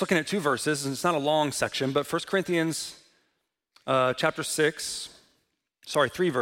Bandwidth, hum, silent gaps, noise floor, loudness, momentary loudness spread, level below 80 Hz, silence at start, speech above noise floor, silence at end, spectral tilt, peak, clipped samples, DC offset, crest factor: 16.5 kHz; none; none; -77 dBFS; -27 LUFS; 8 LU; -66 dBFS; 0 s; 51 dB; 0 s; -4 dB/octave; -8 dBFS; under 0.1%; under 0.1%; 20 dB